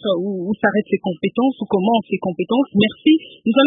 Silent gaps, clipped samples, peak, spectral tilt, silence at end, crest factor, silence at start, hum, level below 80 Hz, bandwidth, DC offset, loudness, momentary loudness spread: none; under 0.1%; -2 dBFS; -11.5 dB/octave; 0 s; 16 dB; 0 s; none; -62 dBFS; 3.9 kHz; under 0.1%; -19 LUFS; 6 LU